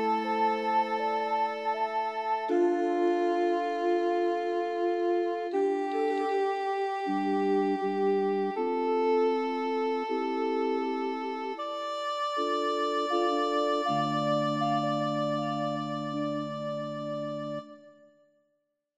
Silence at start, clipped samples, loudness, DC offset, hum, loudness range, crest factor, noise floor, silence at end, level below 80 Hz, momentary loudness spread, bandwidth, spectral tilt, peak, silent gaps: 0 s; under 0.1%; -29 LUFS; under 0.1%; none; 3 LU; 12 dB; -78 dBFS; 1.05 s; -84 dBFS; 7 LU; 9.4 kHz; -6 dB/octave; -16 dBFS; none